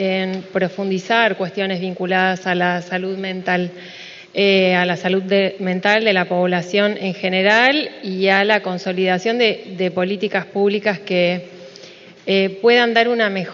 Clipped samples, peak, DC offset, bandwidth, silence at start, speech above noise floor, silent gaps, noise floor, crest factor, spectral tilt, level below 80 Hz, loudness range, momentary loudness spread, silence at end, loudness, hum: under 0.1%; 0 dBFS; under 0.1%; 7.4 kHz; 0 s; 23 dB; none; -41 dBFS; 18 dB; -5.5 dB/octave; -66 dBFS; 3 LU; 10 LU; 0 s; -17 LUFS; none